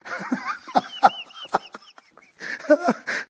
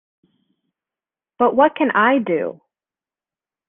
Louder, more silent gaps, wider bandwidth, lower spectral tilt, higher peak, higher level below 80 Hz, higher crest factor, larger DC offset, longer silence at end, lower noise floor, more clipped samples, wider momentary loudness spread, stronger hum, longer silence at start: second, -23 LUFS vs -17 LUFS; neither; first, 9 kHz vs 3.8 kHz; second, -4.5 dB/octave vs -9 dB/octave; about the same, -2 dBFS vs -2 dBFS; about the same, -70 dBFS vs -68 dBFS; first, 24 dB vs 18 dB; neither; second, 0.05 s vs 1.15 s; second, -53 dBFS vs under -90 dBFS; neither; first, 14 LU vs 8 LU; neither; second, 0.05 s vs 1.4 s